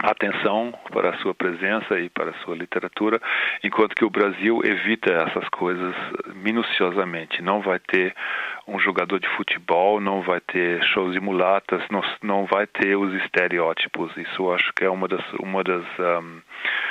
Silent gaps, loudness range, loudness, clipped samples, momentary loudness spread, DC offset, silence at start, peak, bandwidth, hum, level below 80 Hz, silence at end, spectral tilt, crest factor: none; 2 LU; -23 LUFS; under 0.1%; 7 LU; under 0.1%; 0 s; -2 dBFS; 8.4 kHz; none; -68 dBFS; 0 s; -6 dB/octave; 20 dB